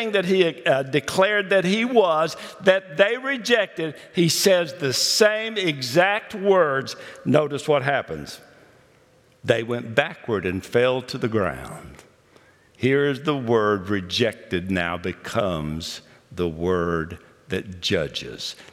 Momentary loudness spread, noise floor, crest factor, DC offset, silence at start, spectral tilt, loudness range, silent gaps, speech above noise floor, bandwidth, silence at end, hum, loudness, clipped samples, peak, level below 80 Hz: 12 LU; -57 dBFS; 20 dB; under 0.1%; 0 s; -4 dB/octave; 6 LU; none; 34 dB; 17 kHz; 0.1 s; none; -22 LUFS; under 0.1%; -2 dBFS; -56 dBFS